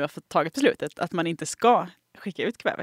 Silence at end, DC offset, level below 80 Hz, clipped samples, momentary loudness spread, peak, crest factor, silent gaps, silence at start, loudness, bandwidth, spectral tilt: 0 s; under 0.1%; -72 dBFS; under 0.1%; 13 LU; -6 dBFS; 20 dB; none; 0 s; -25 LUFS; 16 kHz; -4.5 dB/octave